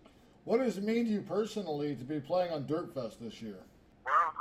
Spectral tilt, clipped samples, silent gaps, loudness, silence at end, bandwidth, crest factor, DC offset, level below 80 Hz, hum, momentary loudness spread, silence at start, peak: -6.5 dB/octave; under 0.1%; none; -34 LUFS; 0 s; 14.5 kHz; 18 dB; under 0.1%; -70 dBFS; none; 14 LU; 0.45 s; -18 dBFS